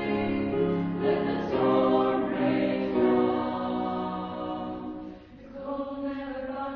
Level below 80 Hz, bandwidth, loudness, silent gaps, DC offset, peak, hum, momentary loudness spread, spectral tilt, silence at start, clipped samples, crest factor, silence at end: -56 dBFS; 5.8 kHz; -28 LUFS; none; under 0.1%; -12 dBFS; none; 13 LU; -9 dB/octave; 0 s; under 0.1%; 16 dB; 0 s